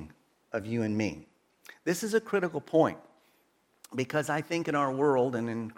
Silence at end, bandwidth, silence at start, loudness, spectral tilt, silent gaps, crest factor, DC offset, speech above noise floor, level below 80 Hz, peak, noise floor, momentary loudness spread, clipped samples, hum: 0.05 s; 17 kHz; 0 s; -30 LUFS; -5.5 dB/octave; none; 20 dB; under 0.1%; 40 dB; -68 dBFS; -10 dBFS; -70 dBFS; 12 LU; under 0.1%; none